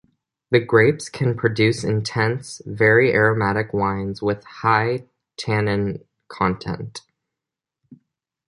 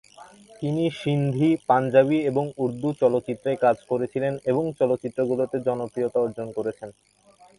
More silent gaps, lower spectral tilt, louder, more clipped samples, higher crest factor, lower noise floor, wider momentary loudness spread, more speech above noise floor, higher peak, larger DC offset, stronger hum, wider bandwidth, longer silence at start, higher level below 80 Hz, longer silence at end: neither; second, -6 dB/octave vs -8 dB/octave; first, -20 LUFS vs -24 LUFS; neither; about the same, 20 dB vs 20 dB; first, -86 dBFS vs -48 dBFS; first, 15 LU vs 10 LU; first, 66 dB vs 25 dB; first, -2 dBFS vs -6 dBFS; neither; neither; about the same, 11.5 kHz vs 11.5 kHz; first, 0.5 s vs 0.2 s; first, -50 dBFS vs -64 dBFS; first, 1.5 s vs 0.65 s